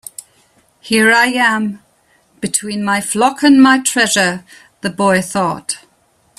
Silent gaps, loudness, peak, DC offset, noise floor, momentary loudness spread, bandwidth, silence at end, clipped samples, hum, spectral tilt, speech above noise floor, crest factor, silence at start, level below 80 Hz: none; -13 LUFS; 0 dBFS; under 0.1%; -56 dBFS; 15 LU; 14.5 kHz; 0.6 s; under 0.1%; none; -3 dB/octave; 43 dB; 16 dB; 0.85 s; -56 dBFS